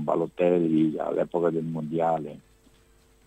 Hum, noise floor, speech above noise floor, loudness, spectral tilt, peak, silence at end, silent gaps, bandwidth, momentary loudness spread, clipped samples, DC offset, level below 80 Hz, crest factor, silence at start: none; -59 dBFS; 34 dB; -26 LUFS; -9 dB/octave; -10 dBFS; 0.9 s; none; 8.8 kHz; 8 LU; under 0.1%; under 0.1%; -62 dBFS; 16 dB; 0 s